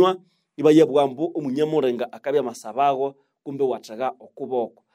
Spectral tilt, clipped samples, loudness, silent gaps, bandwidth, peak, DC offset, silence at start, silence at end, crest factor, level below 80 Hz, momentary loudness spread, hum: -6.5 dB/octave; under 0.1%; -22 LUFS; none; 14.5 kHz; -4 dBFS; under 0.1%; 0 s; 0.25 s; 18 dB; -76 dBFS; 13 LU; none